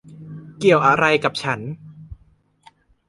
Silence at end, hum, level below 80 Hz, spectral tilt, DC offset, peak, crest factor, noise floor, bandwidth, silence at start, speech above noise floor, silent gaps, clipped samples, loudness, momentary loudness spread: 0.95 s; none; -52 dBFS; -5.5 dB/octave; under 0.1%; -2 dBFS; 20 dB; -57 dBFS; 11.5 kHz; 0.1 s; 40 dB; none; under 0.1%; -18 LUFS; 24 LU